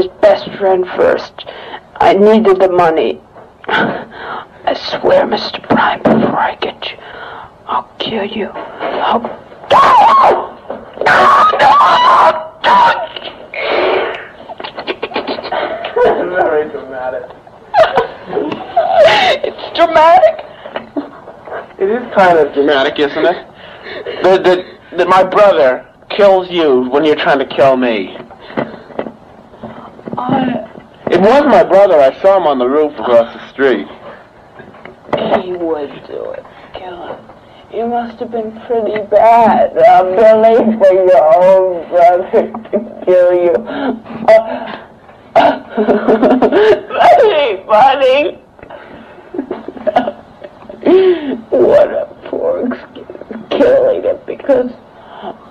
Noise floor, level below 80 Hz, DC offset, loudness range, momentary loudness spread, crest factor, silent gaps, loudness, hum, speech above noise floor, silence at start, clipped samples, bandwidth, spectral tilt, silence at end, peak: -38 dBFS; -48 dBFS; under 0.1%; 8 LU; 19 LU; 12 dB; none; -11 LUFS; none; 27 dB; 0 s; under 0.1%; 10 kHz; -5.5 dB/octave; 0.2 s; 0 dBFS